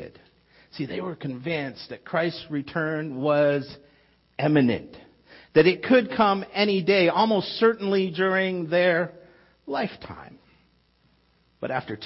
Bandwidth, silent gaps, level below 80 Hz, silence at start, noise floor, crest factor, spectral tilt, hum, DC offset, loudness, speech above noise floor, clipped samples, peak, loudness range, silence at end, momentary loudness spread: 5.8 kHz; none; -62 dBFS; 0 s; -64 dBFS; 18 dB; -9.5 dB/octave; none; under 0.1%; -24 LUFS; 40 dB; under 0.1%; -6 dBFS; 7 LU; 0 s; 15 LU